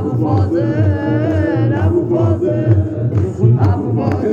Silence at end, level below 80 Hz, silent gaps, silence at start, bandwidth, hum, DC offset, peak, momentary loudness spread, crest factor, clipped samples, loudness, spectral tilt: 0 s; -46 dBFS; none; 0 s; 7 kHz; none; under 0.1%; 0 dBFS; 3 LU; 14 dB; under 0.1%; -15 LUFS; -10 dB/octave